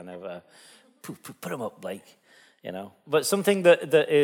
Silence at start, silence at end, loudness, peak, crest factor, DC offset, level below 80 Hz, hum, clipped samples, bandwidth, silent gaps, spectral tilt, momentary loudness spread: 0 s; 0 s; -23 LUFS; -6 dBFS; 22 dB; under 0.1%; -76 dBFS; none; under 0.1%; 17.5 kHz; none; -4 dB/octave; 23 LU